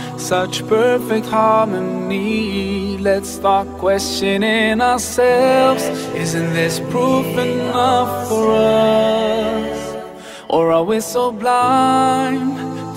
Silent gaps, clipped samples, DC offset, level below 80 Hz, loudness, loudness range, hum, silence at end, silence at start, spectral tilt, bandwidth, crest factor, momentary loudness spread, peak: none; under 0.1%; under 0.1%; -46 dBFS; -16 LUFS; 2 LU; none; 0 s; 0 s; -4.5 dB/octave; 16 kHz; 14 dB; 8 LU; -2 dBFS